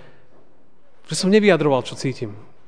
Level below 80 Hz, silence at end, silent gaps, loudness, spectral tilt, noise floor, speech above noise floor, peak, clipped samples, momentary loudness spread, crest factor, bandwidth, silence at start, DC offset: -64 dBFS; 0.3 s; none; -19 LUFS; -5 dB/octave; -58 dBFS; 40 dB; -2 dBFS; under 0.1%; 15 LU; 20 dB; 10 kHz; 1.1 s; 1%